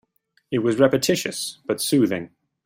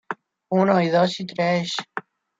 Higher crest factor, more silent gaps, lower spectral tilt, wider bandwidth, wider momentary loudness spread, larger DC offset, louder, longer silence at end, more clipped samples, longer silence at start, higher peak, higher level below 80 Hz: about the same, 20 dB vs 18 dB; neither; second, -4.5 dB/octave vs -6 dB/octave; first, 16.5 kHz vs 7.8 kHz; second, 11 LU vs 17 LU; neither; about the same, -22 LUFS vs -21 LUFS; about the same, 0.4 s vs 0.4 s; neither; first, 0.5 s vs 0.1 s; first, -2 dBFS vs -6 dBFS; first, -62 dBFS vs -68 dBFS